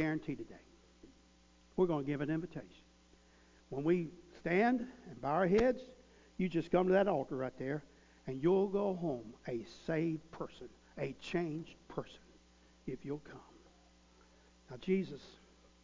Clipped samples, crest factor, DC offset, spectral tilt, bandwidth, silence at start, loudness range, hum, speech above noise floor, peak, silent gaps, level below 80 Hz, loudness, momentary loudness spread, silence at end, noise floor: under 0.1%; 20 dB; under 0.1%; -7.5 dB/octave; 7.6 kHz; 0 s; 10 LU; none; 30 dB; -18 dBFS; none; -64 dBFS; -37 LUFS; 19 LU; 0.5 s; -65 dBFS